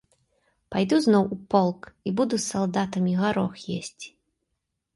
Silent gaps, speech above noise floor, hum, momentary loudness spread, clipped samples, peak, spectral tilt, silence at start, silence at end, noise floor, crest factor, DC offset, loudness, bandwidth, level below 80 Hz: none; 56 dB; none; 13 LU; under 0.1%; -8 dBFS; -5.5 dB/octave; 0.7 s; 0.85 s; -80 dBFS; 18 dB; under 0.1%; -25 LUFS; 11.5 kHz; -60 dBFS